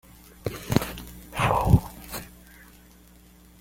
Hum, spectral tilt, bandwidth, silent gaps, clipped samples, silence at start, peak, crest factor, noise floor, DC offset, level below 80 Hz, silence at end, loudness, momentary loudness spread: none; -6 dB/octave; 17 kHz; none; under 0.1%; 0.45 s; -2 dBFS; 26 dB; -52 dBFS; under 0.1%; -40 dBFS; 1.3 s; -26 LUFS; 16 LU